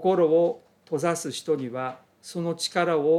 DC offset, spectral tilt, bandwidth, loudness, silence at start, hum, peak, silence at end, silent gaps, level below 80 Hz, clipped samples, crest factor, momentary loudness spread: under 0.1%; -5 dB/octave; 14.5 kHz; -26 LUFS; 0 s; none; -8 dBFS; 0 s; none; -76 dBFS; under 0.1%; 16 dB; 15 LU